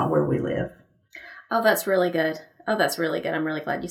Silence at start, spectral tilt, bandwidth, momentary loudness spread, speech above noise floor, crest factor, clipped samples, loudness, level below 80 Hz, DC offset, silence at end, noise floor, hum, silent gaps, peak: 0 s; -5 dB/octave; 18 kHz; 13 LU; 25 dB; 18 dB; under 0.1%; -25 LUFS; -58 dBFS; under 0.1%; 0 s; -49 dBFS; none; none; -8 dBFS